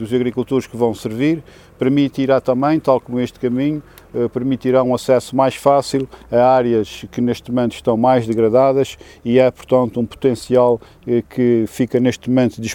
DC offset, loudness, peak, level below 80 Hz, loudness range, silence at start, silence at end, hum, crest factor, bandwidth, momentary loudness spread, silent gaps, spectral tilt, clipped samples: under 0.1%; -17 LUFS; 0 dBFS; -48 dBFS; 2 LU; 0 s; 0 s; none; 16 dB; 16.5 kHz; 7 LU; none; -7 dB/octave; under 0.1%